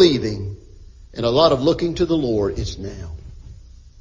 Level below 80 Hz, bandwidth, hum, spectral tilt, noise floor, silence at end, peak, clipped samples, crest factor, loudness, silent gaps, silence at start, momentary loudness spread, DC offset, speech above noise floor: -36 dBFS; 7.6 kHz; none; -6.5 dB/octave; -42 dBFS; 0.35 s; -2 dBFS; under 0.1%; 18 dB; -19 LUFS; none; 0 s; 21 LU; under 0.1%; 23 dB